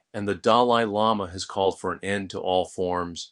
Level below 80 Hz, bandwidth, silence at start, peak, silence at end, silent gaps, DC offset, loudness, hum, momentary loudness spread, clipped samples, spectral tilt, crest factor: -60 dBFS; 11 kHz; 0.15 s; -4 dBFS; 0.05 s; none; under 0.1%; -25 LUFS; none; 10 LU; under 0.1%; -4.5 dB/octave; 20 dB